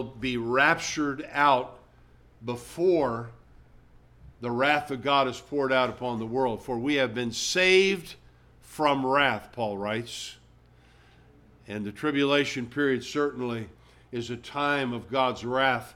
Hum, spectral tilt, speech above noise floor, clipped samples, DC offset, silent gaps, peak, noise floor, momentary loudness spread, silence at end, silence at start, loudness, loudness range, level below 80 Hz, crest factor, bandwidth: none; -4 dB/octave; 30 dB; under 0.1%; under 0.1%; none; -8 dBFS; -57 dBFS; 14 LU; 0 s; 0 s; -26 LUFS; 5 LU; -58 dBFS; 20 dB; 16 kHz